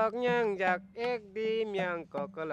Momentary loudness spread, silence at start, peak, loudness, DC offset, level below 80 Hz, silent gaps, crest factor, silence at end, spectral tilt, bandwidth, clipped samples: 8 LU; 0 s; -16 dBFS; -32 LUFS; under 0.1%; -72 dBFS; none; 16 dB; 0 s; -6 dB/octave; 8.4 kHz; under 0.1%